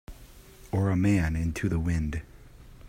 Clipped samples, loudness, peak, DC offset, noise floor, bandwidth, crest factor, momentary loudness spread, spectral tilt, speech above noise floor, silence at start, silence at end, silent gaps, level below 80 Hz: under 0.1%; -28 LUFS; -14 dBFS; under 0.1%; -50 dBFS; 16 kHz; 16 dB; 9 LU; -7.5 dB/octave; 24 dB; 0.1 s; 0 s; none; -40 dBFS